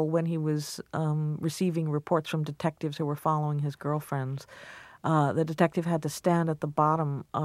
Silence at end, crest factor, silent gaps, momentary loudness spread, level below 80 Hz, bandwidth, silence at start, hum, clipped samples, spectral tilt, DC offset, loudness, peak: 0 s; 22 dB; none; 7 LU; -68 dBFS; 15 kHz; 0 s; none; under 0.1%; -7 dB/octave; under 0.1%; -29 LUFS; -8 dBFS